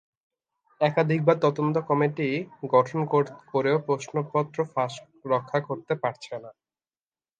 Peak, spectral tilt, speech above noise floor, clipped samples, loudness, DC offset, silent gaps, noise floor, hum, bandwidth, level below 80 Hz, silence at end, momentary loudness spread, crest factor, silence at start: -4 dBFS; -7 dB/octave; over 65 dB; under 0.1%; -26 LUFS; under 0.1%; none; under -90 dBFS; none; 9.2 kHz; -74 dBFS; 0.9 s; 9 LU; 22 dB; 0.8 s